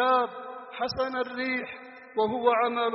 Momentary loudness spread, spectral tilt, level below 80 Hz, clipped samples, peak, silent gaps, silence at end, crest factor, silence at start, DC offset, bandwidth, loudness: 16 LU; -1.5 dB/octave; -64 dBFS; under 0.1%; -10 dBFS; none; 0 s; 18 dB; 0 s; under 0.1%; 5.8 kHz; -28 LUFS